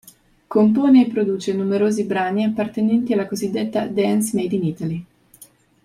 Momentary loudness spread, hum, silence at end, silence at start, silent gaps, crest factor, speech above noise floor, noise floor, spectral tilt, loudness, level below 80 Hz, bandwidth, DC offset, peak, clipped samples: 9 LU; none; 0.4 s; 0.5 s; none; 14 dB; 31 dB; -49 dBFS; -6.5 dB/octave; -19 LUFS; -60 dBFS; 15.5 kHz; under 0.1%; -4 dBFS; under 0.1%